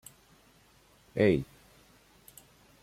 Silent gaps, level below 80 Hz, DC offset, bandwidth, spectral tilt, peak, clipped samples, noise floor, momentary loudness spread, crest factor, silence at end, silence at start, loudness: none; -60 dBFS; under 0.1%; 16 kHz; -7 dB/octave; -12 dBFS; under 0.1%; -62 dBFS; 27 LU; 22 dB; 1.4 s; 1.15 s; -29 LUFS